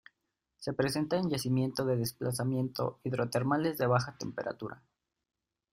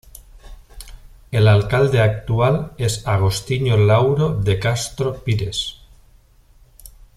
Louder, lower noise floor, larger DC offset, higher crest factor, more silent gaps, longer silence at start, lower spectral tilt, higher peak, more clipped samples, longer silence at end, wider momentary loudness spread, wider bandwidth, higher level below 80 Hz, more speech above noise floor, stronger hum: second, -32 LUFS vs -18 LUFS; first, -83 dBFS vs -51 dBFS; neither; about the same, 20 dB vs 16 dB; neither; first, 0.6 s vs 0.35 s; about the same, -6 dB/octave vs -6 dB/octave; second, -12 dBFS vs -2 dBFS; neither; first, 0.95 s vs 0.3 s; about the same, 9 LU vs 9 LU; first, 16 kHz vs 14 kHz; second, -66 dBFS vs -40 dBFS; first, 51 dB vs 34 dB; neither